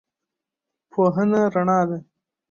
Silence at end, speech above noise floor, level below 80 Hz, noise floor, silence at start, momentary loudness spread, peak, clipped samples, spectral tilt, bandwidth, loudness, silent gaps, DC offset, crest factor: 0.5 s; 66 dB; -64 dBFS; -85 dBFS; 0.95 s; 10 LU; -8 dBFS; under 0.1%; -8.5 dB/octave; 7 kHz; -21 LUFS; none; under 0.1%; 16 dB